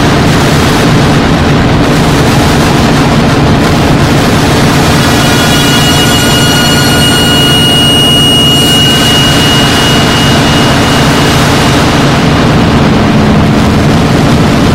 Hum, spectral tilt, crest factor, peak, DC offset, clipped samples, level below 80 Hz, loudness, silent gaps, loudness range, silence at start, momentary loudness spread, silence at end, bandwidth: none; -4.5 dB/octave; 6 dB; 0 dBFS; under 0.1%; 1%; -20 dBFS; -5 LUFS; none; 2 LU; 0 s; 3 LU; 0 s; 16.5 kHz